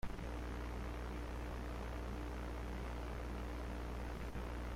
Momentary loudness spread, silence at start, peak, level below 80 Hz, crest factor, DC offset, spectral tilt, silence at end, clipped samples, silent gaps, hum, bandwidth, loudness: 0 LU; 0.05 s; -30 dBFS; -46 dBFS; 12 dB; under 0.1%; -6.5 dB/octave; 0 s; under 0.1%; none; 60 Hz at -45 dBFS; 15.5 kHz; -46 LUFS